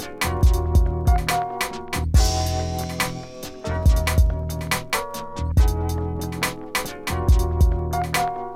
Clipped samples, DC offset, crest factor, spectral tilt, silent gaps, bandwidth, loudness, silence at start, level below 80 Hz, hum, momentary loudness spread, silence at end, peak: under 0.1%; under 0.1%; 16 dB; -5 dB/octave; none; 16.5 kHz; -23 LUFS; 0 s; -24 dBFS; none; 8 LU; 0 s; -6 dBFS